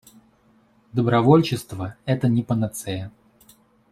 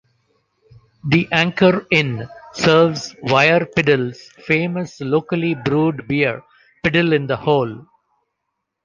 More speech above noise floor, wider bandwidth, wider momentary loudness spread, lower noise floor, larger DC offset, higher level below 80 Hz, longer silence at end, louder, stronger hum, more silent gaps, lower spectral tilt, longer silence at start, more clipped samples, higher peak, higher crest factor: second, 38 dB vs 59 dB; first, 14.5 kHz vs 7.6 kHz; first, 16 LU vs 13 LU; second, -59 dBFS vs -77 dBFS; neither; about the same, -56 dBFS vs -52 dBFS; second, 0.85 s vs 1 s; second, -22 LUFS vs -17 LUFS; neither; neither; about the same, -7 dB/octave vs -6 dB/octave; about the same, 0.95 s vs 1.05 s; neither; about the same, -4 dBFS vs -2 dBFS; about the same, 20 dB vs 18 dB